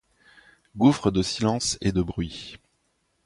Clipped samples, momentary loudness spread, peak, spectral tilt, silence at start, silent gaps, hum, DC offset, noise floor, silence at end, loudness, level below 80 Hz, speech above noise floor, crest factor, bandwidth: under 0.1%; 18 LU; -6 dBFS; -5 dB/octave; 0.75 s; none; none; under 0.1%; -71 dBFS; 0.7 s; -24 LUFS; -46 dBFS; 47 dB; 20 dB; 11.5 kHz